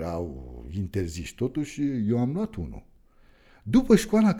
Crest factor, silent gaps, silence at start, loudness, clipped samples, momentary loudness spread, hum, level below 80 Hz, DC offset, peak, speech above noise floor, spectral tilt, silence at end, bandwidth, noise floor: 22 dB; none; 0 s; -26 LUFS; under 0.1%; 18 LU; none; -44 dBFS; under 0.1%; -4 dBFS; 31 dB; -7 dB/octave; 0 s; 14.5 kHz; -56 dBFS